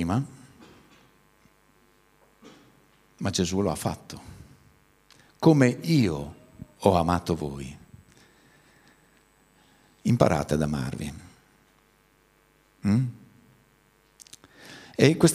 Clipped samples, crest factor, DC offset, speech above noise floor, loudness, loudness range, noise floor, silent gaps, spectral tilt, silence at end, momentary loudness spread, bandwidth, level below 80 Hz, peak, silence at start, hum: under 0.1%; 26 dB; under 0.1%; 39 dB; -25 LUFS; 9 LU; -63 dBFS; none; -6 dB/octave; 0 s; 26 LU; 15.5 kHz; -52 dBFS; -2 dBFS; 0 s; none